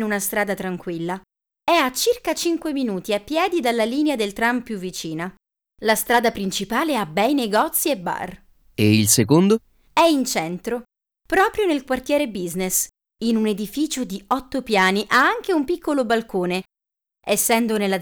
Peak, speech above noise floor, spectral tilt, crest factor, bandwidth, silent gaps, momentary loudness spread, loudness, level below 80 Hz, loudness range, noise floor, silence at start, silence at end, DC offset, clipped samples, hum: -2 dBFS; 66 dB; -4 dB/octave; 20 dB; over 20 kHz; none; 11 LU; -21 LUFS; -52 dBFS; 4 LU; -87 dBFS; 0 s; 0 s; under 0.1%; under 0.1%; none